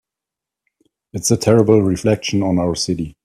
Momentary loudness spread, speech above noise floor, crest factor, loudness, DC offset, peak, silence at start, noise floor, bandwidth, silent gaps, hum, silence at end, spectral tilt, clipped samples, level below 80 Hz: 9 LU; 70 dB; 18 dB; -16 LUFS; under 0.1%; 0 dBFS; 1.15 s; -86 dBFS; 14.5 kHz; none; none; 0.15 s; -5.5 dB/octave; under 0.1%; -48 dBFS